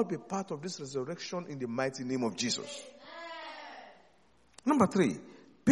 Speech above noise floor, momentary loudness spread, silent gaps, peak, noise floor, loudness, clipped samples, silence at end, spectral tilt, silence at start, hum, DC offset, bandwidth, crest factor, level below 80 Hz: 34 dB; 19 LU; none; -10 dBFS; -66 dBFS; -34 LUFS; under 0.1%; 0 s; -5 dB/octave; 0 s; none; under 0.1%; 11.5 kHz; 22 dB; -74 dBFS